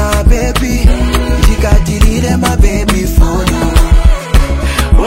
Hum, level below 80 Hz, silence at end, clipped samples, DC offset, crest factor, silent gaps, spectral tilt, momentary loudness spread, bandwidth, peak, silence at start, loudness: none; -10 dBFS; 0 s; 4%; under 0.1%; 8 dB; none; -5.5 dB/octave; 3 LU; 16.5 kHz; 0 dBFS; 0 s; -11 LUFS